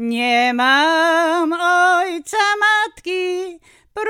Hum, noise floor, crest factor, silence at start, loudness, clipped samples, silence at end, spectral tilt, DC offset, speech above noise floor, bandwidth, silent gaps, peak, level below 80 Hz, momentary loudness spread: none; -38 dBFS; 14 dB; 0 s; -16 LUFS; under 0.1%; 0 s; -1.5 dB/octave; under 0.1%; 22 dB; 16.5 kHz; none; -4 dBFS; -62 dBFS; 9 LU